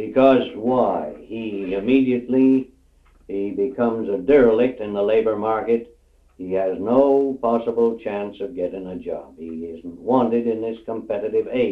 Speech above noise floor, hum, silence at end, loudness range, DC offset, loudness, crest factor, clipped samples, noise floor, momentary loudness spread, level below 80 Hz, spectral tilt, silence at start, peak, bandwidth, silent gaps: 34 dB; none; 0 s; 5 LU; under 0.1%; -21 LUFS; 18 dB; under 0.1%; -54 dBFS; 15 LU; -54 dBFS; -8.5 dB/octave; 0 s; -2 dBFS; 4.6 kHz; none